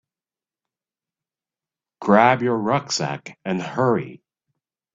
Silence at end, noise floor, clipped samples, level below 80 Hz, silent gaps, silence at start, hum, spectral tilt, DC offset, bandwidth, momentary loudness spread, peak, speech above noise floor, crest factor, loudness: 0.8 s; under -90 dBFS; under 0.1%; -64 dBFS; none; 2 s; none; -5 dB/octave; under 0.1%; 7.8 kHz; 14 LU; -2 dBFS; over 70 dB; 22 dB; -20 LUFS